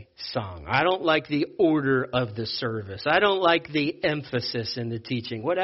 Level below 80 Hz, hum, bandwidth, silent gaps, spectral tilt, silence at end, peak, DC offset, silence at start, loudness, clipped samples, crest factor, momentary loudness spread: -56 dBFS; none; 6 kHz; none; -3.5 dB/octave; 0 s; -6 dBFS; under 0.1%; 0 s; -25 LUFS; under 0.1%; 20 dB; 10 LU